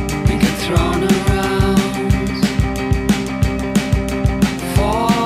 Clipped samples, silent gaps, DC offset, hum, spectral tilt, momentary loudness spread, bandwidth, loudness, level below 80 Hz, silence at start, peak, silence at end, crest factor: under 0.1%; none; under 0.1%; none; -6 dB/octave; 3 LU; 16 kHz; -17 LUFS; -24 dBFS; 0 s; -2 dBFS; 0 s; 14 dB